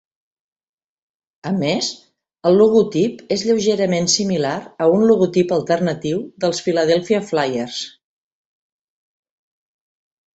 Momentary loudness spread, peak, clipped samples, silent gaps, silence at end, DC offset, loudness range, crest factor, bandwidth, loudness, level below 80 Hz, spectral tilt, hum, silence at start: 10 LU; -2 dBFS; under 0.1%; none; 2.45 s; under 0.1%; 6 LU; 18 dB; 8.2 kHz; -18 LUFS; -60 dBFS; -4.5 dB/octave; none; 1.45 s